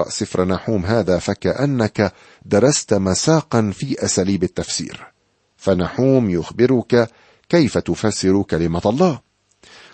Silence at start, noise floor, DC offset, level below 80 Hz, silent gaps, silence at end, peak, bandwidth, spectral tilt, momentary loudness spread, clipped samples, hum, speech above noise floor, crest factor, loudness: 0 s; -59 dBFS; under 0.1%; -46 dBFS; none; 0.75 s; -2 dBFS; 8.8 kHz; -5.5 dB/octave; 6 LU; under 0.1%; none; 42 dB; 16 dB; -18 LUFS